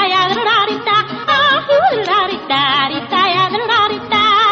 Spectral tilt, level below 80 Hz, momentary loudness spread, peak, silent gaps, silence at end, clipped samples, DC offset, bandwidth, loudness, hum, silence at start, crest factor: -4 dB/octave; -52 dBFS; 4 LU; -2 dBFS; none; 0 s; under 0.1%; under 0.1%; 7.8 kHz; -13 LUFS; none; 0 s; 12 dB